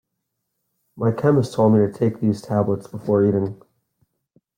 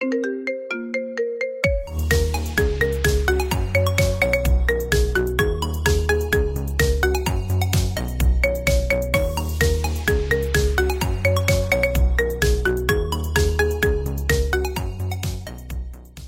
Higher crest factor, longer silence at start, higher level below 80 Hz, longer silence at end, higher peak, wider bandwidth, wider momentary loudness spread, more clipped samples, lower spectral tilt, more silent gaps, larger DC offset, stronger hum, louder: about the same, 16 dB vs 18 dB; first, 0.95 s vs 0 s; second, -60 dBFS vs -24 dBFS; first, 1.05 s vs 0 s; about the same, -4 dBFS vs -2 dBFS; second, 14 kHz vs 16.5 kHz; about the same, 7 LU vs 7 LU; neither; first, -9 dB/octave vs -5 dB/octave; neither; neither; neither; about the same, -20 LUFS vs -21 LUFS